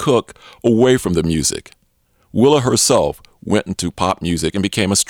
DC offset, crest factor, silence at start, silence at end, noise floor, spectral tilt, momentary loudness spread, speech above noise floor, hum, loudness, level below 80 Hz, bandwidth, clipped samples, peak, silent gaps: under 0.1%; 16 dB; 0 s; 0.05 s; -60 dBFS; -4.5 dB/octave; 9 LU; 44 dB; none; -16 LUFS; -40 dBFS; 19.5 kHz; under 0.1%; -2 dBFS; none